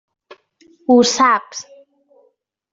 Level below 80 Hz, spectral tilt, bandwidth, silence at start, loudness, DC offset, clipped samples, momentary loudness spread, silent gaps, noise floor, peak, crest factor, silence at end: -62 dBFS; -2.5 dB/octave; 7.8 kHz; 0.9 s; -14 LUFS; under 0.1%; under 0.1%; 20 LU; none; -62 dBFS; -2 dBFS; 16 dB; 1.1 s